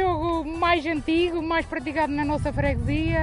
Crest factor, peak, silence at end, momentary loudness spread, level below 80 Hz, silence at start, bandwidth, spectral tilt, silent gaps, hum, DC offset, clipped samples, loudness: 16 dB; -8 dBFS; 0 s; 3 LU; -36 dBFS; 0 s; 11 kHz; -7 dB/octave; none; none; under 0.1%; under 0.1%; -24 LUFS